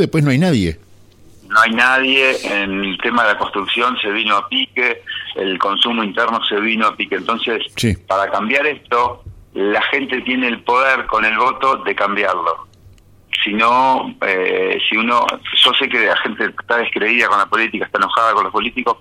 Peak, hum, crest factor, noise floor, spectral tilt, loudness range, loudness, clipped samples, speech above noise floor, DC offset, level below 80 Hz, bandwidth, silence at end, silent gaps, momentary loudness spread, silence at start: 0 dBFS; none; 16 dB; -45 dBFS; -4.5 dB/octave; 3 LU; -15 LUFS; under 0.1%; 29 dB; under 0.1%; -46 dBFS; 16 kHz; 0.05 s; none; 7 LU; 0 s